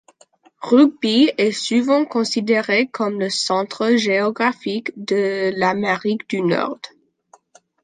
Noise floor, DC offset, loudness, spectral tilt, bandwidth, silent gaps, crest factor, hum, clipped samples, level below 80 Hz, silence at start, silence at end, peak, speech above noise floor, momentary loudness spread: -55 dBFS; under 0.1%; -18 LUFS; -4.5 dB/octave; 9.8 kHz; none; 18 dB; none; under 0.1%; -68 dBFS; 0.6 s; 0.95 s; -2 dBFS; 36 dB; 8 LU